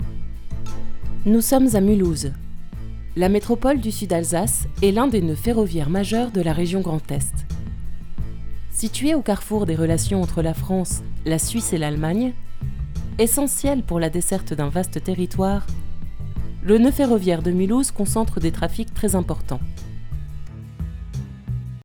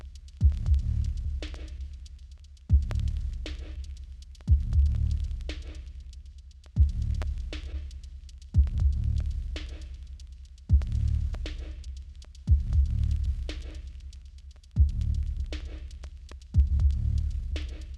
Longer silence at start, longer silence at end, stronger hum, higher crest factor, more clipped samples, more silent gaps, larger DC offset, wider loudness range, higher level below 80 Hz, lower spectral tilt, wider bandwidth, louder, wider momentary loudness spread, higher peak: about the same, 0 s vs 0 s; about the same, 0 s vs 0 s; neither; about the same, 18 dB vs 18 dB; neither; neither; neither; about the same, 4 LU vs 3 LU; about the same, -30 dBFS vs -30 dBFS; second, -5.5 dB/octave vs -7 dB/octave; first, over 20 kHz vs 7.4 kHz; first, -21 LUFS vs -30 LUFS; second, 16 LU vs 20 LU; first, -4 dBFS vs -12 dBFS